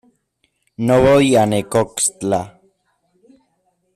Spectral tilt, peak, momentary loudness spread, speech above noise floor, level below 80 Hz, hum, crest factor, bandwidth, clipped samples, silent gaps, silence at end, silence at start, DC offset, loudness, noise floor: -5 dB/octave; -4 dBFS; 11 LU; 52 dB; -46 dBFS; none; 16 dB; 14.5 kHz; under 0.1%; none; 1.45 s; 0.8 s; under 0.1%; -16 LUFS; -67 dBFS